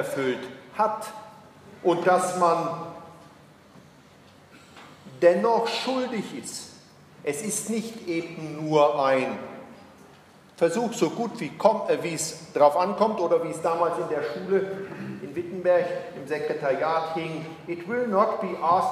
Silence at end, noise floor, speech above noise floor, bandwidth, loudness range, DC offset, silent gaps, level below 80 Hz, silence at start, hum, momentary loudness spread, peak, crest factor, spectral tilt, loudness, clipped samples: 0 s; -53 dBFS; 28 dB; 15.5 kHz; 4 LU; under 0.1%; none; -72 dBFS; 0 s; none; 15 LU; -4 dBFS; 22 dB; -4.5 dB/octave; -25 LUFS; under 0.1%